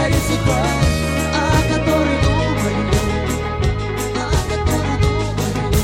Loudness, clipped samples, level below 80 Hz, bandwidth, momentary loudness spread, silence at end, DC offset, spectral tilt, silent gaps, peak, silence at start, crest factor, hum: -18 LUFS; under 0.1%; -24 dBFS; 17 kHz; 4 LU; 0 s; under 0.1%; -5.5 dB/octave; none; -2 dBFS; 0 s; 16 dB; none